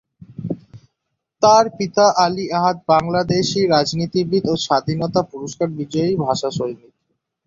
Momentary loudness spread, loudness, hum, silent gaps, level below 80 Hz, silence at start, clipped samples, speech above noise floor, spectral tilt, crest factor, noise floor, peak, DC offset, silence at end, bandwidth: 14 LU; -18 LUFS; none; none; -54 dBFS; 0.3 s; under 0.1%; 59 dB; -5 dB/octave; 18 dB; -77 dBFS; -2 dBFS; under 0.1%; 0.7 s; 7.8 kHz